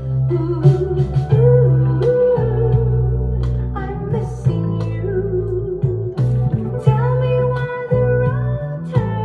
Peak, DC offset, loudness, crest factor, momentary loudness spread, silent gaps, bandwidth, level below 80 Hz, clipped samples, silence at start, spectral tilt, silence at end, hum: 0 dBFS; under 0.1%; -18 LUFS; 16 dB; 8 LU; none; 4.6 kHz; -30 dBFS; under 0.1%; 0 s; -10 dB/octave; 0 s; none